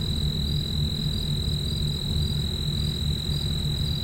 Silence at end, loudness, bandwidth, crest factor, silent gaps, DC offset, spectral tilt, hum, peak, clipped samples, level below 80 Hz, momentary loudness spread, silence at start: 0 s; -27 LUFS; 16 kHz; 12 dB; none; under 0.1%; -5.5 dB/octave; none; -14 dBFS; under 0.1%; -32 dBFS; 1 LU; 0 s